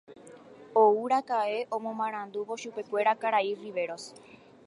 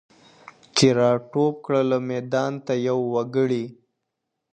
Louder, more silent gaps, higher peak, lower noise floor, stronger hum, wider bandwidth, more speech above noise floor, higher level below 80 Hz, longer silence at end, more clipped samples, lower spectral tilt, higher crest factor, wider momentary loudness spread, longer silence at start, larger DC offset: second, -29 LUFS vs -22 LUFS; neither; second, -10 dBFS vs -2 dBFS; second, -50 dBFS vs -80 dBFS; neither; about the same, 11 kHz vs 11 kHz; second, 22 dB vs 59 dB; second, -84 dBFS vs -62 dBFS; second, 0.45 s vs 0.8 s; neither; second, -4 dB/octave vs -5.5 dB/octave; about the same, 20 dB vs 22 dB; first, 13 LU vs 7 LU; second, 0.1 s vs 0.75 s; neither